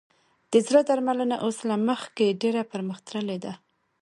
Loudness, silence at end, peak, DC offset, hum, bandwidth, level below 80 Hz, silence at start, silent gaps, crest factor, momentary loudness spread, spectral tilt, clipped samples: -25 LUFS; 0.45 s; -6 dBFS; under 0.1%; none; 11.5 kHz; -74 dBFS; 0.5 s; none; 20 dB; 12 LU; -5 dB/octave; under 0.1%